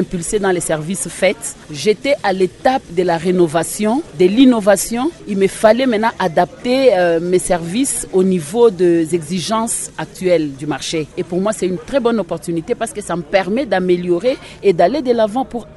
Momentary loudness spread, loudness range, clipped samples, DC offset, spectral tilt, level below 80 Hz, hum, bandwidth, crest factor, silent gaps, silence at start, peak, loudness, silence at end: 9 LU; 5 LU; under 0.1%; under 0.1%; -4.5 dB/octave; -44 dBFS; none; 12 kHz; 16 dB; none; 0 s; 0 dBFS; -16 LUFS; 0.05 s